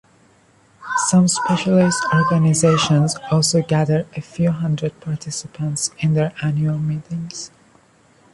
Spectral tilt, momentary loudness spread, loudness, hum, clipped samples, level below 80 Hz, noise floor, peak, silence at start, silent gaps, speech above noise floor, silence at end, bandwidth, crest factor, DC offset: -5 dB/octave; 13 LU; -18 LUFS; none; under 0.1%; -52 dBFS; -54 dBFS; -2 dBFS; 0.8 s; none; 36 dB; 0.85 s; 11.5 kHz; 16 dB; under 0.1%